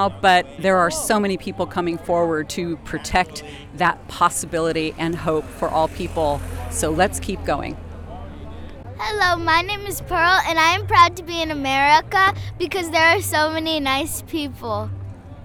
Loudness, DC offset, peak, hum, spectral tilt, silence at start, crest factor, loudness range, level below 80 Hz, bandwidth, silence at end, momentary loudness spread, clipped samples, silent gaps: -20 LUFS; under 0.1%; -2 dBFS; none; -3.5 dB/octave; 0 s; 18 dB; 6 LU; -40 dBFS; over 20 kHz; 0 s; 16 LU; under 0.1%; none